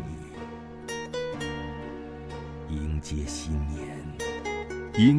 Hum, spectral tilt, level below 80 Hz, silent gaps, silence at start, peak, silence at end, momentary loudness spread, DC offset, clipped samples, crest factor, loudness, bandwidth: none; -6 dB/octave; -40 dBFS; none; 0 s; -8 dBFS; 0 s; 8 LU; under 0.1%; under 0.1%; 22 dB; -33 LUFS; 11 kHz